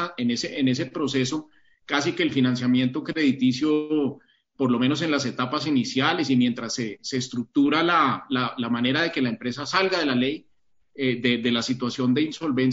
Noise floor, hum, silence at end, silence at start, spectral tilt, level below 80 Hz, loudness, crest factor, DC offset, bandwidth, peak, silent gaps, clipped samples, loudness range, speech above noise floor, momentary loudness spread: -62 dBFS; none; 0 s; 0 s; -4 dB/octave; -66 dBFS; -24 LUFS; 18 dB; under 0.1%; 7.8 kHz; -6 dBFS; none; under 0.1%; 2 LU; 38 dB; 7 LU